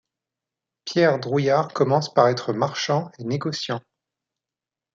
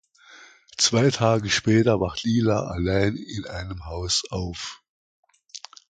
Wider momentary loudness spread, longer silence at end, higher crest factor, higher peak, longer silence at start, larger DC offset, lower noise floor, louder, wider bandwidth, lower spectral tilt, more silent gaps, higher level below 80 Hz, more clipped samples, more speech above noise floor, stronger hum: second, 9 LU vs 16 LU; first, 1.15 s vs 0.3 s; about the same, 22 dB vs 20 dB; about the same, -2 dBFS vs -4 dBFS; first, 0.85 s vs 0.3 s; neither; first, -89 dBFS vs -50 dBFS; about the same, -22 LUFS vs -23 LUFS; second, 7.6 kHz vs 9.4 kHz; about the same, -5.5 dB/octave vs -4.5 dB/octave; second, none vs 4.89-5.23 s; second, -68 dBFS vs -44 dBFS; neither; first, 68 dB vs 27 dB; neither